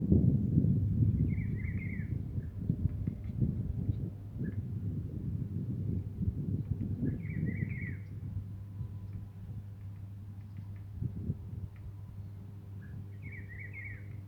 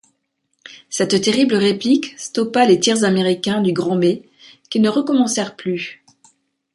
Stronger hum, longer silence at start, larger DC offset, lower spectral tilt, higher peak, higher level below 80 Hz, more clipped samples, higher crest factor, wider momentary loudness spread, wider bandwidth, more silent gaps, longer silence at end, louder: neither; second, 0 s vs 0.7 s; neither; first, -11 dB/octave vs -4.5 dB/octave; second, -12 dBFS vs -2 dBFS; first, -48 dBFS vs -62 dBFS; neither; first, 22 dB vs 16 dB; first, 16 LU vs 10 LU; second, 3.2 kHz vs 11.5 kHz; neither; second, 0 s vs 0.8 s; second, -37 LUFS vs -17 LUFS